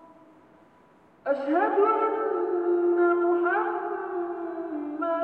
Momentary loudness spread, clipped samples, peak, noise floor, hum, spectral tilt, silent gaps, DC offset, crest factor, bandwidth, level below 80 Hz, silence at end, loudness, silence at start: 11 LU; under 0.1%; -12 dBFS; -57 dBFS; none; -7.5 dB/octave; none; under 0.1%; 14 dB; 4.2 kHz; -78 dBFS; 0 s; -26 LUFS; 0.05 s